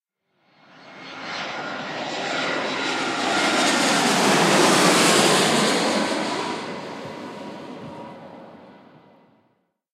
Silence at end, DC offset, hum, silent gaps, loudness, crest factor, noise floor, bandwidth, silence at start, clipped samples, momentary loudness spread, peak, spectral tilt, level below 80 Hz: 1.2 s; under 0.1%; none; none; -20 LUFS; 20 dB; -68 dBFS; 16 kHz; 0.8 s; under 0.1%; 21 LU; -2 dBFS; -2.5 dB/octave; -72 dBFS